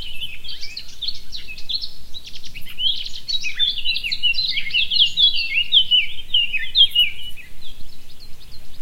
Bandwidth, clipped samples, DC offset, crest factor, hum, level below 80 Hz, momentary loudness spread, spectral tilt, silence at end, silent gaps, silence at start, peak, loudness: 16 kHz; under 0.1%; under 0.1%; 16 dB; none; -38 dBFS; 21 LU; 0 dB/octave; 0 s; none; 0 s; -2 dBFS; -17 LUFS